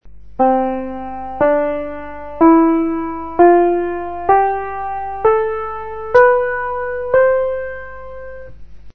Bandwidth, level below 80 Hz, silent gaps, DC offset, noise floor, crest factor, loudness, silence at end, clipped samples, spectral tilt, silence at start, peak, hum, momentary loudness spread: 4.7 kHz; -42 dBFS; none; 2%; -37 dBFS; 16 dB; -16 LUFS; 0 s; under 0.1%; -8.5 dB/octave; 0 s; 0 dBFS; 50 Hz at -45 dBFS; 18 LU